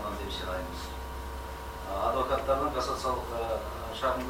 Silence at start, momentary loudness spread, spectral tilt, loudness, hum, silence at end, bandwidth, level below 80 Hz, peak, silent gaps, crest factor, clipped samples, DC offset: 0 s; 11 LU; -5 dB/octave; -33 LUFS; none; 0 s; 16.5 kHz; -42 dBFS; -14 dBFS; none; 18 dB; under 0.1%; under 0.1%